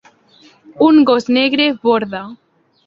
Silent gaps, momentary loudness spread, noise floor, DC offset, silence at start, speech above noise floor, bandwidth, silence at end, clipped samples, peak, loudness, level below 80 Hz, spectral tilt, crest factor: none; 16 LU; -49 dBFS; under 0.1%; 0.75 s; 35 dB; 7.4 kHz; 0.5 s; under 0.1%; -2 dBFS; -13 LUFS; -58 dBFS; -5.5 dB/octave; 14 dB